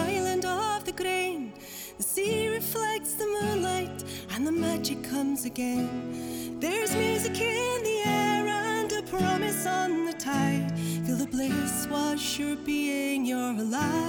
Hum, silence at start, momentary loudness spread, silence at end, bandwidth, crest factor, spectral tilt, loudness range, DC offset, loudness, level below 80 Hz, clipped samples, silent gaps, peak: none; 0 s; 6 LU; 0 s; over 20 kHz; 14 dB; -4 dB/octave; 3 LU; under 0.1%; -29 LUFS; -58 dBFS; under 0.1%; none; -14 dBFS